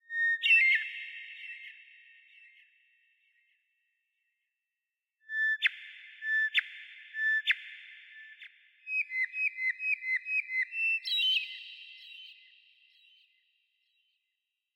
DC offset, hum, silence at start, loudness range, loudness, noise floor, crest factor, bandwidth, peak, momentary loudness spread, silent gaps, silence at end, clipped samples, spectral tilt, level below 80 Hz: under 0.1%; none; 0.1 s; 12 LU; -28 LUFS; -89 dBFS; 20 dB; 16 kHz; -14 dBFS; 22 LU; none; 2.4 s; under 0.1%; 8.5 dB/octave; under -90 dBFS